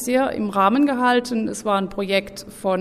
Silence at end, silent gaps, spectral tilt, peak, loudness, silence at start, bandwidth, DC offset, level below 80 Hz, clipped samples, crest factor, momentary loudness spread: 0 s; none; -4.5 dB/octave; -4 dBFS; -20 LUFS; 0 s; 15.5 kHz; under 0.1%; -52 dBFS; under 0.1%; 16 dB; 7 LU